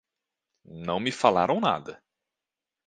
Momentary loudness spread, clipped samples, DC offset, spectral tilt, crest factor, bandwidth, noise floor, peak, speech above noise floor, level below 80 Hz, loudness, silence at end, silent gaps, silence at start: 14 LU; under 0.1%; under 0.1%; -5 dB/octave; 24 dB; 9.6 kHz; -89 dBFS; -4 dBFS; 63 dB; -64 dBFS; -25 LUFS; 0.9 s; none; 0.7 s